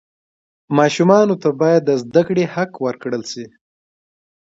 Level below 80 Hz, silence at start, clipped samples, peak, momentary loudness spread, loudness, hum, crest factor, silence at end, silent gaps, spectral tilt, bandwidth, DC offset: -64 dBFS; 0.7 s; under 0.1%; 0 dBFS; 12 LU; -16 LUFS; none; 18 dB; 1.15 s; none; -6 dB/octave; 7.8 kHz; under 0.1%